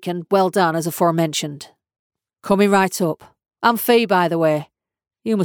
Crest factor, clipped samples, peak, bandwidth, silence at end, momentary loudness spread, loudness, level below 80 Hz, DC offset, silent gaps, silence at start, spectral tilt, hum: 16 dB; under 0.1%; -4 dBFS; over 20 kHz; 0 s; 15 LU; -18 LUFS; -62 dBFS; under 0.1%; 1.99-2.10 s; 0 s; -5 dB/octave; none